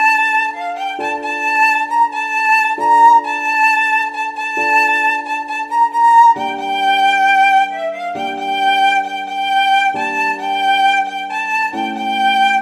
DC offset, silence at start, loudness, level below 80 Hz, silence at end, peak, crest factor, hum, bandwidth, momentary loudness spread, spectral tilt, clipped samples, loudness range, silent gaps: under 0.1%; 0 s; -14 LUFS; -66 dBFS; 0 s; 0 dBFS; 14 dB; none; 14 kHz; 10 LU; -1.5 dB/octave; under 0.1%; 3 LU; none